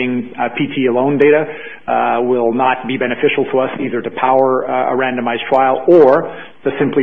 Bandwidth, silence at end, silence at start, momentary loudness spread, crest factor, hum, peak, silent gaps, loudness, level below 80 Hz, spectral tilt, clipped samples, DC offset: 4.8 kHz; 0 s; 0 s; 10 LU; 14 dB; none; 0 dBFS; none; -14 LUFS; -60 dBFS; -8.5 dB/octave; under 0.1%; 1%